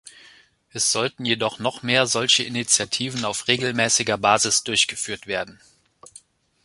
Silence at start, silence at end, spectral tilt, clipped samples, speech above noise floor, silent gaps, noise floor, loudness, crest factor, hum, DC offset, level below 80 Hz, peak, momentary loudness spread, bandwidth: 0.05 s; 1.1 s; -1.5 dB/octave; under 0.1%; 31 dB; none; -53 dBFS; -20 LUFS; 22 dB; none; under 0.1%; -60 dBFS; -2 dBFS; 9 LU; 11.5 kHz